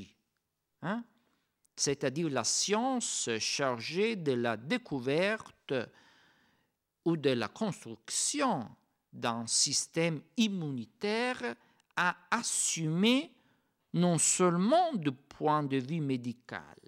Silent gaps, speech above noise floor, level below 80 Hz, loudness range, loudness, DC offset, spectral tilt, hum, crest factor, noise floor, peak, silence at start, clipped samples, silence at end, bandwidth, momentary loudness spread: none; 52 dB; -78 dBFS; 5 LU; -31 LUFS; under 0.1%; -3.5 dB/octave; none; 18 dB; -83 dBFS; -16 dBFS; 0 s; under 0.1%; 0.2 s; 16 kHz; 11 LU